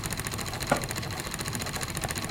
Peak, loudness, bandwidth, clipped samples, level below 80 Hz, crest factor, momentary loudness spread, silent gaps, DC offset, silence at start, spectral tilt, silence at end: -8 dBFS; -31 LUFS; 17 kHz; under 0.1%; -46 dBFS; 24 dB; 4 LU; none; under 0.1%; 0 s; -3.5 dB/octave; 0 s